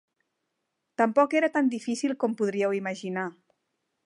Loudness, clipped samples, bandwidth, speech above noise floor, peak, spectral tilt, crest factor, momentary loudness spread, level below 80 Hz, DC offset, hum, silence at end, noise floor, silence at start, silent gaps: -26 LUFS; under 0.1%; 11 kHz; 55 dB; -8 dBFS; -5.5 dB/octave; 20 dB; 10 LU; -82 dBFS; under 0.1%; none; 0.75 s; -81 dBFS; 1 s; none